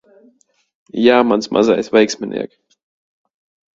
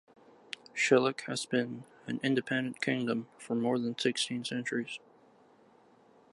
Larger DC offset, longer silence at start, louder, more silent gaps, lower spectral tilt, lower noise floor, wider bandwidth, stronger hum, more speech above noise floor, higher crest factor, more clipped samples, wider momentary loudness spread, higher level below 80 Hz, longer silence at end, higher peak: neither; first, 0.95 s vs 0.75 s; first, -15 LUFS vs -32 LUFS; neither; about the same, -4.5 dB/octave vs -4 dB/octave; second, -57 dBFS vs -62 dBFS; second, 7.8 kHz vs 11.5 kHz; neither; first, 42 dB vs 30 dB; about the same, 18 dB vs 22 dB; neither; about the same, 14 LU vs 14 LU; first, -58 dBFS vs -82 dBFS; about the same, 1.3 s vs 1.35 s; first, 0 dBFS vs -12 dBFS